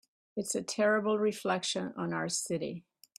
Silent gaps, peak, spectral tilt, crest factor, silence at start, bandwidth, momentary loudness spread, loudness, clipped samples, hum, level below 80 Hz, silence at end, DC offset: none; -16 dBFS; -3.5 dB/octave; 18 dB; 0.35 s; 15.5 kHz; 11 LU; -32 LUFS; under 0.1%; none; -76 dBFS; 0.4 s; under 0.1%